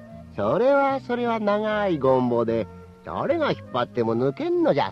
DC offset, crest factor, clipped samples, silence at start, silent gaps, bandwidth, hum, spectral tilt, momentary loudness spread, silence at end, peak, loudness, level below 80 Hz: under 0.1%; 16 dB; under 0.1%; 0 s; none; 7 kHz; none; -8 dB/octave; 9 LU; 0 s; -8 dBFS; -23 LUFS; -56 dBFS